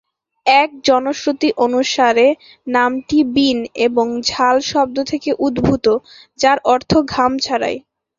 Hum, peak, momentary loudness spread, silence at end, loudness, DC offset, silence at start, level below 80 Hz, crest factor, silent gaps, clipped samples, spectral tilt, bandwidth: none; 0 dBFS; 7 LU; 0.4 s; -16 LUFS; under 0.1%; 0.45 s; -46 dBFS; 16 dB; none; under 0.1%; -4 dB/octave; 7.6 kHz